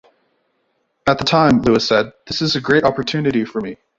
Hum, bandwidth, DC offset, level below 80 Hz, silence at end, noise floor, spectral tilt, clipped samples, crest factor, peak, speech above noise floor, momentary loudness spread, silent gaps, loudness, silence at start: none; 7.8 kHz; under 0.1%; -46 dBFS; 0.25 s; -67 dBFS; -5.5 dB/octave; under 0.1%; 16 dB; -2 dBFS; 50 dB; 9 LU; none; -17 LUFS; 1.05 s